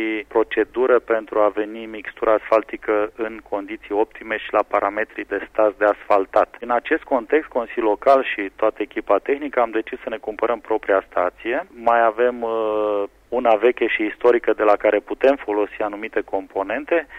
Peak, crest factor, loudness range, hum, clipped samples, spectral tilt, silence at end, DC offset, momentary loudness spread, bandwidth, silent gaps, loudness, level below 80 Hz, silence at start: -4 dBFS; 16 dB; 3 LU; none; under 0.1%; -6 dB/octave; 0 s; under 0.1%; 9 LU; 6.6 kHz; none; -21 LUFS; -54 dBFS; 0 s